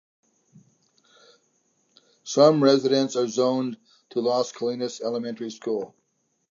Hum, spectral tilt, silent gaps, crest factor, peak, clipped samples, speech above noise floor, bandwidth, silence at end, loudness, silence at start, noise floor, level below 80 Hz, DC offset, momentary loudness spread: none; -5 dB/octave; none; 20 dB; -6 dBFS; under 0.1%; 50 dB; 7.6 kHz; 0.65 s; -24 LUFS; 2.25 s; -73 dBFS; -82 dBFS; under 0.1%; 14 LU